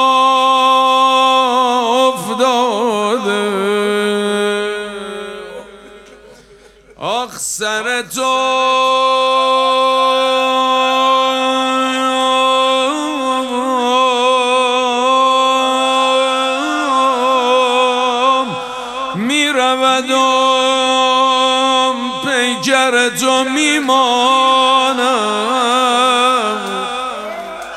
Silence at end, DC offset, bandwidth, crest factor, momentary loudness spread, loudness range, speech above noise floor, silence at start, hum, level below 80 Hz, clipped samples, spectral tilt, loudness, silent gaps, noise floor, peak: 0 s; under 0.1%; 14.5 kHz; 14 dB; 9 LU; 6 LU; 29 dB; 0 s; none; -56 dBFS; under 0.1%; -2 dB/octave; -13 LUFS; none; -43 dBFS; 0 dBFS